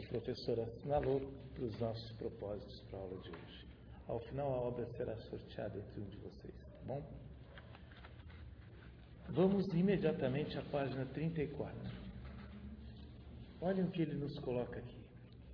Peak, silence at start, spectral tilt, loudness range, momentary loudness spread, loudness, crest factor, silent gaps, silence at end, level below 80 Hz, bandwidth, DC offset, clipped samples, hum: -20 dBFS; 0 s; -7 dB/octave; 11 LU; 20 LU; -41 LUFS; 22 dB; none; 0 s; -58 dBFS; 5.4 kHz; under 0.1%; under 0.1%; none